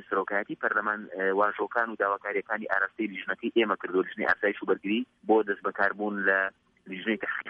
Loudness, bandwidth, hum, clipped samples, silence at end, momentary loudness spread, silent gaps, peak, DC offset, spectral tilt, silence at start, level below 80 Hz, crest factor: -28 LUFS; 5.6 kHz; none; under 0.1%; 0 s; 6 LU; none; -10 dBFS; under 0.1%; -7.5 dB/octave; 0 s; -74 dBFS; 18 dB